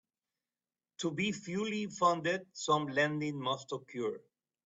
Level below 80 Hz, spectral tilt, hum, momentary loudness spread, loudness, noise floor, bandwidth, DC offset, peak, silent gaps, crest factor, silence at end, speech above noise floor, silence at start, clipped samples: -76 dBFS; -4.5 dB/octave; none; 9 LU; -34 LUFS; under -90 dBFS; 8.2 kHz; under 0.1%; -16 dBFS; none; 20 dB; 0.5 s; over 56 dB; 1 s; under 0.1%